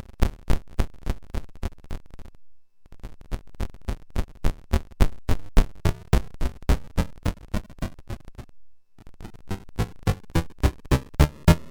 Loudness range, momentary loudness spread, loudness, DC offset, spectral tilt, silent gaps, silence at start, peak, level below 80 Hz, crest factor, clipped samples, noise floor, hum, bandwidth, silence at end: 9 LU; 17 LU; -28 LUFS; under 0.1%; -6.5 dB/octave; none; 0.2 s; -4 dBFS; -28 dBFS; 20 dB; under 0.1%; -45 dBFS; none; over 20 kHz; 0 s